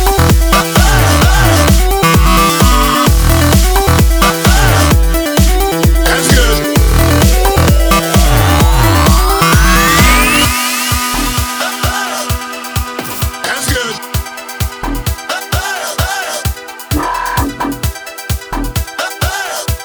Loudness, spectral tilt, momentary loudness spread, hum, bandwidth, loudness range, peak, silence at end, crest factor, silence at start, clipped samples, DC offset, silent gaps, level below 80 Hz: -11 LUFS; -4 dB/octave; 10 LU; none; over 20 kHz; 8 LU; 0 dBFS; 0 s; 10 dB; 0 s; 0.1%; under 0.1%; none; -14 dBFS